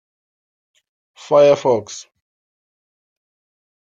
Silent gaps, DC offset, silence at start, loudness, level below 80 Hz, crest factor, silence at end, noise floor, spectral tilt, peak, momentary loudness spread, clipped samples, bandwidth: none; under 0.1%; 1.3 s; -15 LUFS; -68 dBFS; 18 dB; 1.9 s; under -90 dBFS; -5 dB/octave; -2 dBFS; 21 LU; under 0.1%; 7.6 kHz